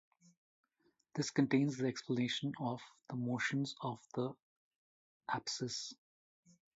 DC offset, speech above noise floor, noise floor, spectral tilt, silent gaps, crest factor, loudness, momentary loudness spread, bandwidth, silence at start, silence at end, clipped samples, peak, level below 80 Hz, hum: under 0.1%; 40 dB; -78 dBFS; -4.5 dB/octave; 4.42-5.20 s; 22 dB; -39 LUFS; 12 LU; 7.6 kHz; 1.15 s; 0.8 s; under 0.1%; -18 dBFS; -82 dBFS; none